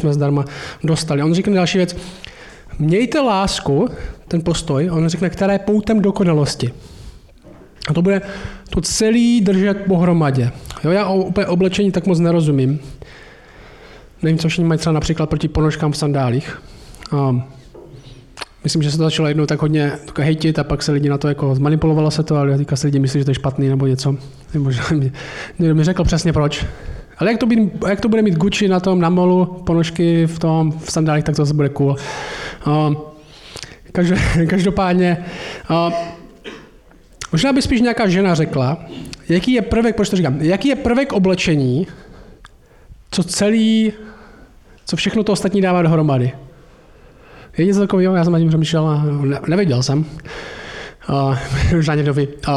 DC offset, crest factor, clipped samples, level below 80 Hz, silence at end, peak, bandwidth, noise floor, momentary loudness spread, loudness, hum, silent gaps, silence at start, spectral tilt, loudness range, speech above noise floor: under 0.1%; 10 dB; under 0.1%; -36 dBFS; 0 s; -8 dBFS; 12 kHz; -45 dBFS; 13 LU; -17 LUFS; none; none; 0 s; -6.5 dB/octave; 3 LU; 29 dB